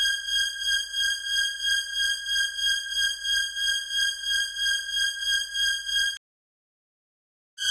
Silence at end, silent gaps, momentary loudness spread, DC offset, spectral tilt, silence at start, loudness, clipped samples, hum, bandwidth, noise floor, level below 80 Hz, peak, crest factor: 0 s; 6.17-7.57 s; 2 LU; under 0.1%; 4.5 dB/octave; 0 s; -24 LUFS; under 0.1%; none; 16.5 kHz; under -90 dBFS; -56 dBFS; -12 dBFS; 16 dB